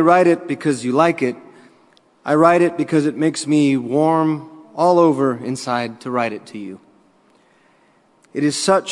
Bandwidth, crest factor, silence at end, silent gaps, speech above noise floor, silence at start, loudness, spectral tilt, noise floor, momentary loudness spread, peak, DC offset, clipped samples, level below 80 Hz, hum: 11.5 kHz; 18 dB; 0 s; none; 39 dB; 0 s; -17 LUFS; -5.5 dB/octave; -56 dBFS; 17 LU; 0 dBFS; under 0.1%; under 0.1%; -66 dBFS; none